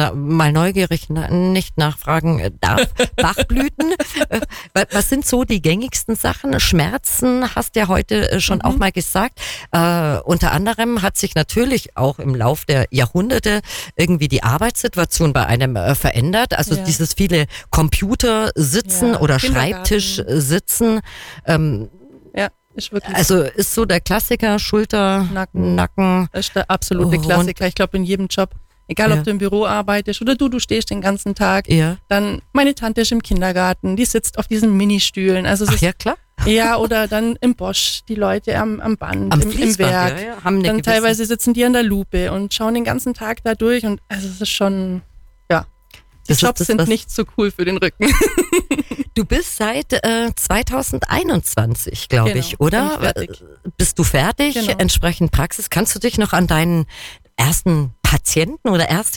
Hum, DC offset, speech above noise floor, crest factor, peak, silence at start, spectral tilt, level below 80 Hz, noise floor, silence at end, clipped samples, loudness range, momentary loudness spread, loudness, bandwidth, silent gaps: none; under 0.1%; 30 dB; 12 dB; -4 dBFS; 0 s; -4.5 dB/octave; -30 dBFS; -46 dBFS; 0 s; under 0.1%; 2 LU; 6 LU; -17 LUFS; 19 kHz; none